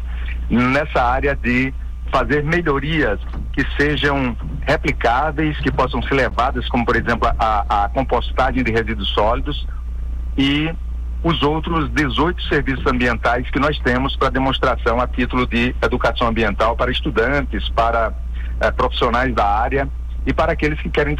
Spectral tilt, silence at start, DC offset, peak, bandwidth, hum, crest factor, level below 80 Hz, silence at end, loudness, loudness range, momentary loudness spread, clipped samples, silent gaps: -6.5 dB/octave; 0 s; under 0.1%; -6 dBFS; 9.4 kHz; none; 12 dB; -24 dBFS; 0 s; -19 LUFS; 2 LU; 6 LU; under 0.1%; none